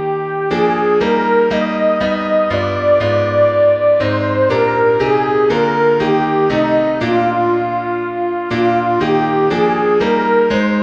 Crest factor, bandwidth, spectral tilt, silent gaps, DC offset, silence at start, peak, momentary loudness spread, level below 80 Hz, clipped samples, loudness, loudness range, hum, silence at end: 12 dB; 7.6 kHz; -7 dB/octave; none; 0.2%; 0 s; -2 dBFS; 4 LU; -46 dBFS; under 0.1%; -14 LUFS; 2 LU; none; 0 s